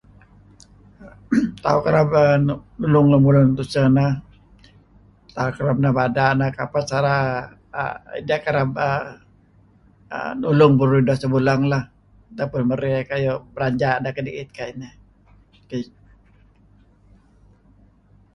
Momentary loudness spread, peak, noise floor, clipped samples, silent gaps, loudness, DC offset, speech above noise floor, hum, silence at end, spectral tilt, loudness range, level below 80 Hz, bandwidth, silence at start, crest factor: 17 LU; -2 dBFS; -54 dBFS; under 0.1%; none; -20 LUFS; under 0.1%; 35 dB; 50 Hz at -50 dBFS; 2.5 s; -8 dB/octave; 11 LU; -48 dBFS; 11 kHz; 1 s; 18 dB